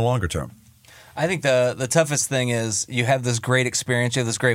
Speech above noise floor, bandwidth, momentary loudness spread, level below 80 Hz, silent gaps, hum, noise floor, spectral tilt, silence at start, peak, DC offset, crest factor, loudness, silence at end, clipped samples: 28 dB; 16.5 kHz; 7 LU; -48 dBFS; none; none; -49 dBFS; -4 dB/octave; 0 s; -4 dBFS; under 0.1%; 18 dB; -21 LUFS; 0 s; under 0.1%